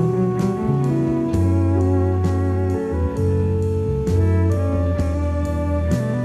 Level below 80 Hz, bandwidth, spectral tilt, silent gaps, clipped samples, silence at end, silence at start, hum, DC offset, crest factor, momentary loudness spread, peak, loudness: -30 dBFS; 9.6 kHz; -9 dB/octave; none; under 0.1%; 0 s; 0 s; none; under 0.1%; 10 dB; 4 LU; -8 dBFS; -20 LUFS